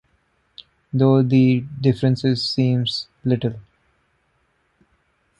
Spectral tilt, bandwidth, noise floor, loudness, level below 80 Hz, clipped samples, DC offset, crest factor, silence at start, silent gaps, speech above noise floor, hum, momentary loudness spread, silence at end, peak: -8 dB/octave; 9.6 kHz; -66 dBFS; -19 LUFS; -56 dBFS; under 0.1%; under 0.1%; 18 dB; 0.95 s; none; 47 dB; none; 10 LU; 1.8 s; -4 dBFS